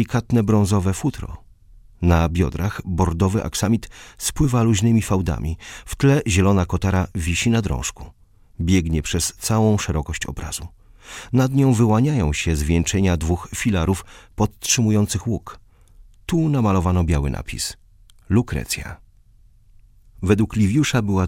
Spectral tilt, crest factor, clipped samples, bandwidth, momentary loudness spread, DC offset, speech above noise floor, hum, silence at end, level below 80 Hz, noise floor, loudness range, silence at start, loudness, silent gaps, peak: -5.5 dB/octave; 18 dB; under 0.1%; 16.5 kHz; 11 LU; under 0.1%; 32 dB; none; 0 s; -34 dBFS; -51 dBFS; 3 LU; 0 s; -20 LUFS; none; -2 dBFS